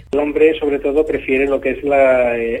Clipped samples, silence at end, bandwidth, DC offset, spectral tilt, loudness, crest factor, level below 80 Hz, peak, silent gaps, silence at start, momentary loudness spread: under 0.1%; 0 s; 9.2 kHz; under 0.1%; -6.5 dB/octave; -15 LUFS; 14 dB; -40 dBFS; -2 dBFS; none; 0.15 s; 5 LU